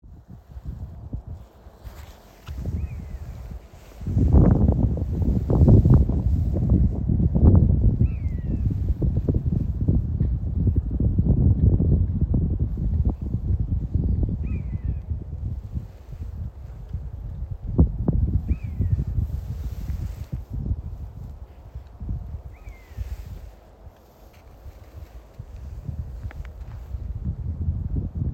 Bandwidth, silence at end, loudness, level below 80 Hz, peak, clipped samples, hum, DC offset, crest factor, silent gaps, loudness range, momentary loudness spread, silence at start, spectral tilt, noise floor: 3.1 kHz; 0 s; -24 LUFS; -28 dBFS; -4 dBFS; under 0.1%; none; under 0.1%; 18 dB; none; 19 LU; 22 LU; 0.05 s; -11 dB/octave; -49 dBFS